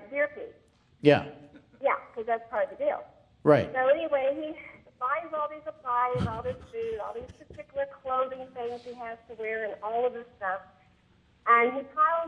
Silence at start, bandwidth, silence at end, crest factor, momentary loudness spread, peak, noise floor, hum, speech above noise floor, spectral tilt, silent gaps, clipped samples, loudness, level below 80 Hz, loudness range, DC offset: 0 s; 9.8 kHz; 0 s; 24 dB; 16 LU; -6 dBFS; -63 dBFS; none; 35 dB; -7.5 dB/octave; none; under 0.1%; -29 LUFS; -60 dBFS; 7 LU; under 0.1%